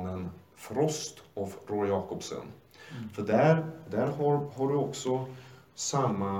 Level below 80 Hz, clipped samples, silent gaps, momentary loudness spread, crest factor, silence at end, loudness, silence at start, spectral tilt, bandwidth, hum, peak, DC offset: -70 dBFS; under 0.1%; none; 18 LU; 20 dB; 0 s; -31 LUFS; 0 s; -5.5 dB/octave; 17.5 kHz; none; -10 dBFS; under 0.1%